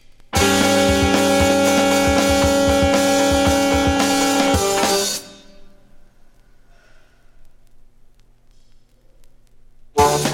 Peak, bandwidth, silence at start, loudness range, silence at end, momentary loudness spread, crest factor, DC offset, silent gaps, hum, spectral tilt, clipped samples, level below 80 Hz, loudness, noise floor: -2 dBFS; 16.5 kHz; 0.35 s; 10 LU; 0 s; 3 LU; 16 dB; under 0.1%; none; none; -4 dB/octave; under 0.1%; -34 dBFS; -16 LUFS; -49 dBFS